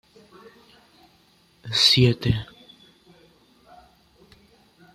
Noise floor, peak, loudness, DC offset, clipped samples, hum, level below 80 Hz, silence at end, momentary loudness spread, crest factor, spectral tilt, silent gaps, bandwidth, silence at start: -59 dBFS; -6 dBFS; -19 LUFS; under 0.1%; under 0.1%; none; -50 dBFS; 2.5 s; 26 LU; 22 dB; -4.5 dB/octave; none; 15.5 kHz; 1.65 s